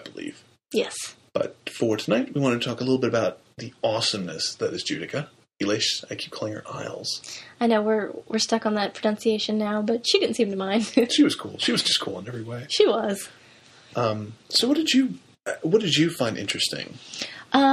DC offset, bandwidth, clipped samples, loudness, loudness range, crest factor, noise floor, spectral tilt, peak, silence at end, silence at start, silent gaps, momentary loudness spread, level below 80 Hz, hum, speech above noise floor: under 0.1%; 14 kHz; under 0.1%; -24 LUFS; 4 LU; 22 dB; -52 dBFS; -4 dB/octave; -2 dBFS; 0 s; 0 s; none; 13 LU; -68 dBFS; none; 27 dB